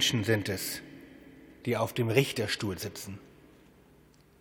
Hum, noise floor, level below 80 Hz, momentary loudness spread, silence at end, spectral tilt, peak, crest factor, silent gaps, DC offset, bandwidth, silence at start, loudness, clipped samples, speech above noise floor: none; -60 dBFS; -66 dBFS; 23 LU; 1.15 s; -4 dB/octave; -8 dBFS; 26 dB; none; under 0.1%; over 20 kHz; 0 s; -31 LUFS; under 0.1%; 30 dB